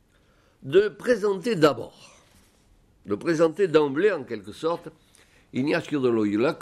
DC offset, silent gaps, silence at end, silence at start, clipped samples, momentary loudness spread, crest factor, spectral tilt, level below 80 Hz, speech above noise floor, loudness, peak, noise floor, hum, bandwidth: under 0.1%; none; 0 s; 0.65 s; under 0.1%; 13 LU; 20 dB; -6 dB/octave; -64 dBFS; 37 dB; -24 LUFS; -6 dBFS; -61 dBFS; none; 13 kHz